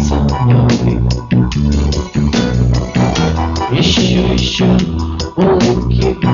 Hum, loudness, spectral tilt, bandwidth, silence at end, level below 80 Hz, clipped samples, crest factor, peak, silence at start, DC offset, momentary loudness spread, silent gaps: none; -13 LUFS; -6 dB/octave; 7.4 kHz; 0 s; -20 dBFS; under 0.1%; 12 dB; 0 dBFS; 0 s; under 0.1%; 5 LU; none